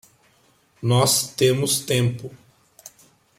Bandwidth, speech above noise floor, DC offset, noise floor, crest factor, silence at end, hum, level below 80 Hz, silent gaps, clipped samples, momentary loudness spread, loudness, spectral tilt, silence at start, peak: 16.5 kHz; 40 dB; under 0.1%; -60 dBFS; 20 dB; 0.5 s; none; -58 dBFS; none; under 0.1%; 14 LU; -20 LUFS; -4 dB/octave; 0.8 s; -4 dBFS